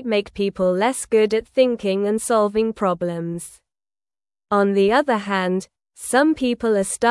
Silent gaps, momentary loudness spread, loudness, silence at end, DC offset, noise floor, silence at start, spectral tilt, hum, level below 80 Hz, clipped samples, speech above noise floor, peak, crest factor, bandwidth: none; 9 LU; -20 LUFS; 0 s; under 0.1%; under -90 dBFS; 0 s; -4.5 dB/octave; none; -54 dBFS; under 0.1%; over 71 dB; -4 dBFS; 16 dB; 12 kHz